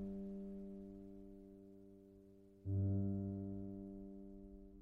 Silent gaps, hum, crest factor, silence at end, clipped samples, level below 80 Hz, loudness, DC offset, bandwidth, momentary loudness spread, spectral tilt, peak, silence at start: none; none; 16 dB; 0 s; under 0.1%; -64 dBFS; -46 LUFS; under 0.1%; 1.5 kHz; 22 LU; -12.5 dB/octave; -30 dBFS; 0 s